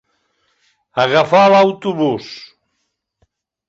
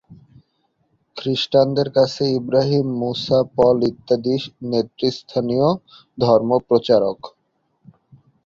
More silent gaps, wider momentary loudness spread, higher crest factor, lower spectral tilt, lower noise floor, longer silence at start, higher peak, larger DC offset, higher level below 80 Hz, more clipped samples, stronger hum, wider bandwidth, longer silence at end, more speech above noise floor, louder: neither; first, 18 LU vs 8 LU; about the same, 16 dB vs 18 dB; about the same, -6 dB/octave vs -7 dB/octave; about the same, -71 dBFS vs -68 dBFS; first, 0.95 s vs 0.1 s; about the same, 0 dBFS vs -2 dBFS; neither; about the same, -58 dBFS vs -56 dBFS; neither; neither; about the same, 7.8 kHz vs 7.6 kHz; about the same, 1.25 s vs 1.15 s; first, 58 dB vs 50 dB; first, -14 LUFS vs -19 LUFS